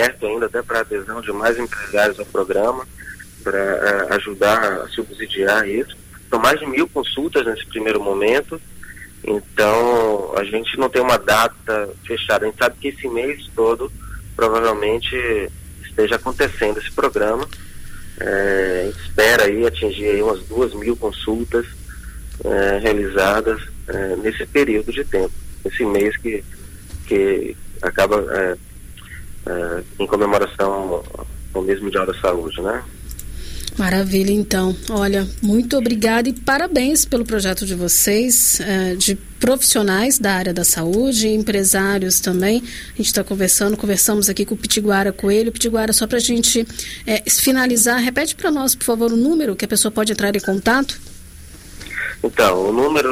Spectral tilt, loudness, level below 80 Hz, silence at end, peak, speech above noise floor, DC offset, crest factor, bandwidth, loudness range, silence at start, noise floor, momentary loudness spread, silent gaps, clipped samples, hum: -3 dB/octave; -18 LUFS; -36 dBFS; 0 s; -2 dBFS; 20 dB; under 0.1%; 16 dB; 16 kHz; 6 LU; 0 s; -38 dBFS; 13 LU; none; under 0.1%; none